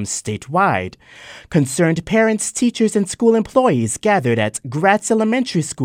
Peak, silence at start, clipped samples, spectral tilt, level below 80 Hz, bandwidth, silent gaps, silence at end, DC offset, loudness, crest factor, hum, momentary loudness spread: 0 dBFS; 0 s; under 0.1%; -5 dB/octave; -52 dBFS; 16 kHz; none; 0 s; under 0.1%; -17 LUFS; 18 dB; none; 7 LU